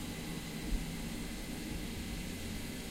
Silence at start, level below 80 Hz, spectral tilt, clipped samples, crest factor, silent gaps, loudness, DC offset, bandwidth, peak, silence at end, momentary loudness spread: 0 s; -44 dBFS; -4.5 dB/octave; under 0.1%; 16 dB; none; -41 LUFS; under 0.1%; 16 kHz; -24 dBFS; 0 s; 2 LU